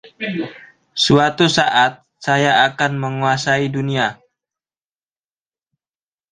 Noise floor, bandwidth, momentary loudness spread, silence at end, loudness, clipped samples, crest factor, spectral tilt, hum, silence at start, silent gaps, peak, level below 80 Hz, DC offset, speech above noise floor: under -90 dBFS; 9.8 kHz; 12 LU; 2.15 s; -16 LUFS; under 0.1%; 18 dB; -4.5 dB/octave; none; 0.05 s; none; 0 dBFS; -56 dBFS; under 0.1%; over 74 dB